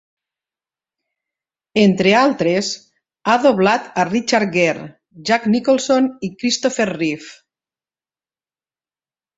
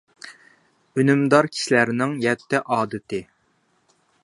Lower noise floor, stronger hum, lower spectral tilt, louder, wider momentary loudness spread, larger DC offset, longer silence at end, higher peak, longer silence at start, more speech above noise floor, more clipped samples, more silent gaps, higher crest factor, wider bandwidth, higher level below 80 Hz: first, under -90 dBFS vs -65 dBFS; neither; about the same, -4.5 dB/octave vs -5.5 dB/octave; first, -17 LUFS vs -21 LUFS; second, 11 LU vs 16 LU; neither; first, 2.05 s vs 1 s; about the same, -2 dBFS vs 0 dBFS; first, 1.75 s vs 0.25 s; first, over 74 dB vs 45 dB; neither; neither; about the same, 18 dB vs 22 dB; second, 8 kHz vs 11.5 kHz; first, -60 dBFS vs -66 dBFS